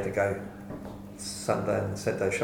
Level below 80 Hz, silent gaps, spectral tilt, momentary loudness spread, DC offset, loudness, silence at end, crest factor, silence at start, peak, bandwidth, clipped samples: -56 dBFS; none; -5 dB/octave; 13 LU; under 0.1%; -31 LUFS; 0 s; 20 dB; 0 s; -12 dBFS; 18 kHz; under 0.1%